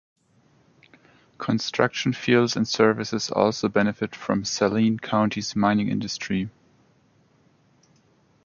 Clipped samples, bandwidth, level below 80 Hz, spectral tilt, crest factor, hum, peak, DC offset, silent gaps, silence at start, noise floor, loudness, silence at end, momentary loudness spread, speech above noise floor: under 0.1%; 7.2 kHz; -58 dBFS; -5 dB/octave; 22 dB; none; -2 dBFS; under 0.1%; none; 1.4 s; -61 dBFS; -23 LUFS; 1.95 s; 7 LU; 38 dB